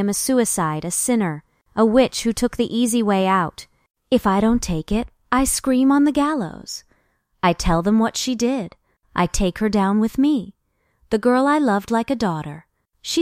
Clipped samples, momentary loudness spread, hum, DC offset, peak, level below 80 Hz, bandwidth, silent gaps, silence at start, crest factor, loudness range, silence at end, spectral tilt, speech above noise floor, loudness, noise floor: under 0.1%; 11 LU; none; under 0.1%; -2 dBFS; -38 dBFS; 16 kHz; 3.90-3.94 s; 0 s; 18 dB; 2 LU; 0 s; -4.5 dB/octave; 46 dB; -20 LUFS; -65 dBFS